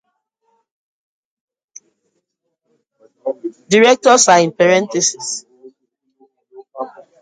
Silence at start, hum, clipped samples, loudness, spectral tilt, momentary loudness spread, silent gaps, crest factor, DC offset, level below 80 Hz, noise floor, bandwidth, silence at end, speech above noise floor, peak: 3.25 s; none; under 0.1%; -13 LUFS; -2.5 dB/octave; 20 LU; none; 18 dB; under 0.1%; -68 dBFS; -73 dBFS; 9.6 kHz; 0.35 s; 60 dB; 0 dBFS